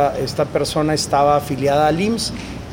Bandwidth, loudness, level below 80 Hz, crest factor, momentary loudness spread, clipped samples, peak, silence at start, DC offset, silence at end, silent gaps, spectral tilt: 17 kHz; -18 LUFS; -40 dBFS; 16 dB; 6 LU; under 0.1%; -2 dBFS; 0 s; under 0.1%; 0 s; none; -5 dB/octave